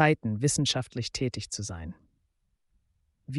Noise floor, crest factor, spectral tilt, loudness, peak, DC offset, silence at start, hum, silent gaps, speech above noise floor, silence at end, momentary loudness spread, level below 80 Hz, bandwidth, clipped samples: -74 dBFS; 22 dB; -4 dB/octave; -29 LUFS; -10 dBFS; under 0.1%; 0 s; none; none; 46 dB; 0 s; 13 LU; -56 dBFS; 11.5 kHz; under 0.1%